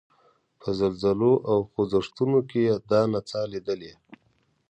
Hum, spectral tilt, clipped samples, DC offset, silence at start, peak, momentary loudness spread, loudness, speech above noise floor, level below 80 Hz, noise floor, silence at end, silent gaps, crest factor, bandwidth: none; -7.5 dB/octave; under 0.1%; under 0.1%; 0.65 s; -8 dBFS; 10 LU; -25 LUFS; 44 dB; -58 dBFS; -68 dBFS; 0.55 s; none; 16 dB; 9 kHz